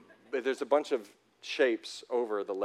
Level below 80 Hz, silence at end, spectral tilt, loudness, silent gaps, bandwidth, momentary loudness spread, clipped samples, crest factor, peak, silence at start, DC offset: under -90 dBFS; 0 s; -3 dB/octave; -32 LUFS; none; 13 kHz; 9 LU; under 0.1%; 20 dB; -12 dBFS; 0.3 s; under 0.1%